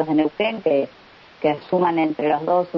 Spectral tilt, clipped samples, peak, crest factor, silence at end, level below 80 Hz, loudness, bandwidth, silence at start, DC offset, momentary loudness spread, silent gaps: -8.5 dB/octave; under 0.1%; -6 dBFS; 14 dB; 0 s; -64 dBFS; -21 LUFS; 5.8 kHz; 0 s; under 0.1%; 4 LU; none